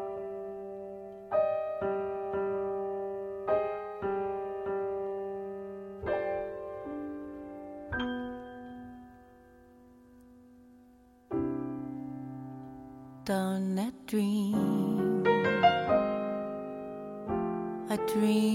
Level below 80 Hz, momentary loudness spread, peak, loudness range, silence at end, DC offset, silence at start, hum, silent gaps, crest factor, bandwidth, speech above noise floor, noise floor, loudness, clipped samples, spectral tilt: -60 dBFS; 16 LU; -10 dBFS; 13 LU; 0 s; under 0.1%; 0 s; none; none; 22 dB; 16.5 kHz; 31 dB; -59 dBFS; -33 LUFS; under 0.1%; -6.5 dB/octave